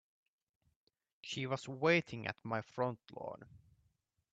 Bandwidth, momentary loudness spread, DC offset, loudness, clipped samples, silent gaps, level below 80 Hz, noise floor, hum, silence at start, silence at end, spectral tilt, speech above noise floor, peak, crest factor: 8.4 kHz; 16 LU; under 0.1%; -38 LUFS; under 0.1%; none; -78 dBFS; -80 dBFS; none; 1.25 s; 0.75 s; -5.5 dB/octave; 41 dB; -18 dBFS; 24 dB